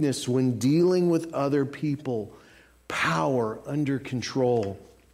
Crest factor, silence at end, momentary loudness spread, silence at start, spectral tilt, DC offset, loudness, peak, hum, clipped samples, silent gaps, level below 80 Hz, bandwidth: 14 dB; 0.3 s; 11 LU; 0 s; -6 dB/octave; under 0.1%; -26 LUFS; -12 dBFS; none; under 0.1%; none; -62 dBFS; 15.5 kHz